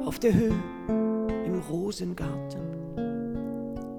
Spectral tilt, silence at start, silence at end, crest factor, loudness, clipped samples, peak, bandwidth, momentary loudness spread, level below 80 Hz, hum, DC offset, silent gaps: -7.5 dB/octave; 0 s; 0 s; 18 dB; -30 LUFS; under 0.1%; -10 dBFS; 18 kHz; 11 LU; -46 dBFS; none; under 0.1%; none